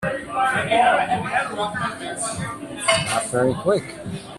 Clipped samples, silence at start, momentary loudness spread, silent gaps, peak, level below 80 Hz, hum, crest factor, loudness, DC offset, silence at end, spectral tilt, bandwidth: under 0.1%; 0 s; 10 LU; none; -4 dBFS; -52 dBFS; none; 20 dB; -21 LUFS; under 0.1%; 0 s; -3.5 dB/octave; 13.5 kHz